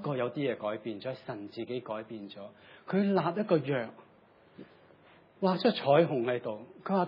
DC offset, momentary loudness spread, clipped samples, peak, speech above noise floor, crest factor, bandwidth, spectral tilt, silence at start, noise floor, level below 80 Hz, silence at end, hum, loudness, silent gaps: under 0.1%; 18 LU; under 0.1%; -12 dBFS; 30 dB; 20 dB; 5.6 kHz; -9.5 dB/octave; 0 s; -61 dBFS; -82 dBFS; 0 s; none; -31 LUFS; none